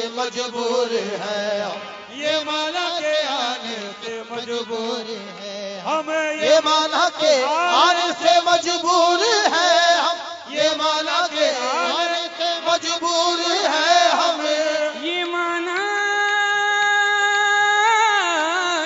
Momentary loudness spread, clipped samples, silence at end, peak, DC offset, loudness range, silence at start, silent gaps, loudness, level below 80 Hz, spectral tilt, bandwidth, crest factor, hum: 12 LU; under 0.1%; 0 s; -2 dBFS; under 0.1%; 7 LU; 0 s; none; -19 LUFS; -74 dBFS; -1 dB/octave; 7.8 kHz; 18 dB; none